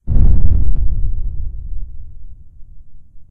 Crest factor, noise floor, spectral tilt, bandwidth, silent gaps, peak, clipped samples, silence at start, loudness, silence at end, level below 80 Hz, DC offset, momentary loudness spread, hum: 12 dB; -32 dBFS; -12.5 dB/octave; 1.1 kHz; none; 0 dBFS; 0.8%; 0.05 s; -20 LUFS; 0.1 s; -16 dBFS; under 0.1%; 23 LU; none